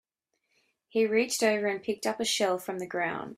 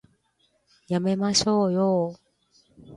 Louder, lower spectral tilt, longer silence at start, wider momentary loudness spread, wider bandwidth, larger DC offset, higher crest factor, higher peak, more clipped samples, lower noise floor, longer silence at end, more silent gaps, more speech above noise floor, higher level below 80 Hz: second, -29 LUFS vs -24 LUFS; second, -2.5 dB/octave vs -5 dB/octave; about the same, 0.95 s vs 0.9 s; about the same, 7 LU vs 8 LU; first, 15.5 kHz vs 11.5 kHz; neither; about the same, 18 dB vs 18 dB; second, -12 dBFS vs -8 dBFS; neither; first, -80 dBFS vs -69 dBFS; about the same, 0.05 s vs 0 s; neither; first, 51 dB vs 46 dB; second, -74 dBFS vs -60 dBFS